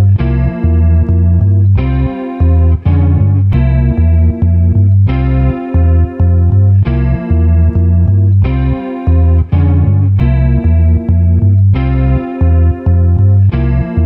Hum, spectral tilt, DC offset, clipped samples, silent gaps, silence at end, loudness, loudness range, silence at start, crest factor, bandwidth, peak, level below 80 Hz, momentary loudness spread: none; -12 dB/octave; under 0.1%; under 0.1%; none; 0 s; -11 LUFS; 1 LU; 0 s; 8 dB; 3.9 kHz; 0 dBFS; -16 dBFS; 4 LU